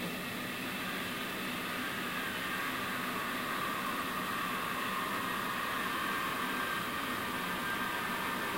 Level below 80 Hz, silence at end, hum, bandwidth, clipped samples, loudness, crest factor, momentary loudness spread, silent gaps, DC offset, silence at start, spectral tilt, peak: -64 dBFS; 0 s; none; 16 kHz; under 0.1%; -35 LUFS; 14 dB; 3 LU; none; under 0.1%; 0 s; -3 dB/octave; -22 dBFS